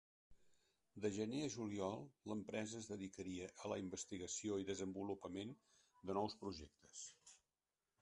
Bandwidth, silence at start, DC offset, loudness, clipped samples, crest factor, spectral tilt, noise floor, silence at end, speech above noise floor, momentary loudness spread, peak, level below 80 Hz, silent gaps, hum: 11 kHz; 0.3 s; under 0.1%; -48 LUFS; under 0.1%; 22 dB; -4.5 dB/octave; under -90 dBFS; 0.65 s; over 43 dB; 12 LU; -28 dBFS; -74 dBFS; none; none